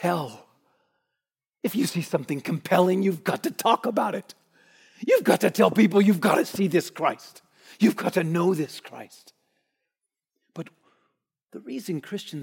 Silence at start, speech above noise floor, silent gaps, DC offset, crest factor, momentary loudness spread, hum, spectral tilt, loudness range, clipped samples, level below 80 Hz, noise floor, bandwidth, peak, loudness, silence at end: 0 s; 63 dB; none; under 0.1%; 20 dB; 20 LU; none; -6 dB/octave; 13 LU; under 0.1%; -76 dBFS; -86 dBFS; 17 kHz; -4 dBFS; -24 LUFS; 0 s